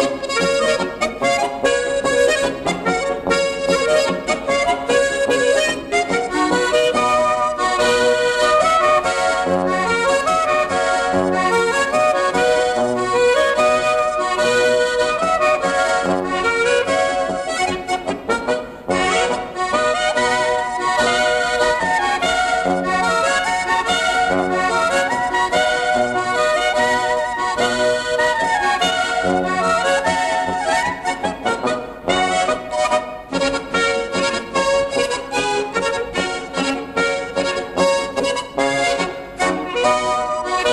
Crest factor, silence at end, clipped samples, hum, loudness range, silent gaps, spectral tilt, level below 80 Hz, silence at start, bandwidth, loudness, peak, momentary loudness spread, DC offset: 14 dB; 0 s; under 0.1%; none; 4 LU; none; -3 dB/octave; -46 dBFS; 0 s; 13 kHz; -18 LUFS; -4 dBFS; 5 LU; under 0.1%